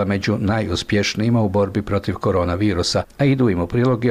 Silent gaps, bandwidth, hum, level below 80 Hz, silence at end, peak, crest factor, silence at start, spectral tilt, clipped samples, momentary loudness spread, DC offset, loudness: none; 14.5 kHz; none; -40 dBFS; 0 s; -8 dBFS; 10 dB; 0 s; -6 dB/octave; under 0.1%; 3 LU; 0.1%; -19 LUFS